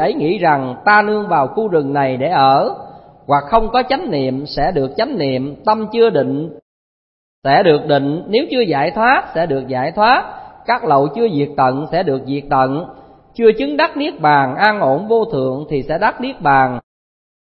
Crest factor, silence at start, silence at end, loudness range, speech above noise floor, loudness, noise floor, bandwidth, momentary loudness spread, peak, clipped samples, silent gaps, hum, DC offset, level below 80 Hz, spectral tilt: 16 dB; 0 s; 0.75 s; 2 LU; over 75 dB; -15 LUFS; under -90 dBFS; 5.8 kHz; 8 LU; 0 dBFS; under 0.1%; 6.62-7.42 s; none; under 0.1%; -40 dBFS; -9.5 dB/octave